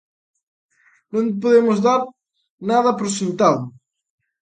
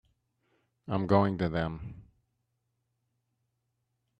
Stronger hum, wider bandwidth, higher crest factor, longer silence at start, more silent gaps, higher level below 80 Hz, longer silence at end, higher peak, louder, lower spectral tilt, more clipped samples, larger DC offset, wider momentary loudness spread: neither; first, 9.4 kHz vs 6.4 kHz; about the same, 20 dB vs 24 dB; first, 1.15 s vs 0.85 s; first, 2.50-2.58 s vs none; second, -68 dBFS vs -58 dBFS; second, 0.7 s vs 2.2 s; first, 0 dBFS vs -10 dBFS; first, -18 LUFS vs -30 LUFS; second, -5.5 dB/octave vs -9 dB/octave; neither; neither; second, 13 LU vs 20 LU